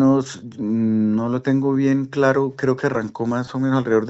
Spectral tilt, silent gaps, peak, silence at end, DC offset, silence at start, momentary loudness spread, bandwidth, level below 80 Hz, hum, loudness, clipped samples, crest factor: -7 dB/octave; none; -4 dBFS; 0 s; under 0.1%; 0 s; 6 LU; 8 kHz; -58 dBFS; none; -20 LUFS; under 0.1%; 16 dB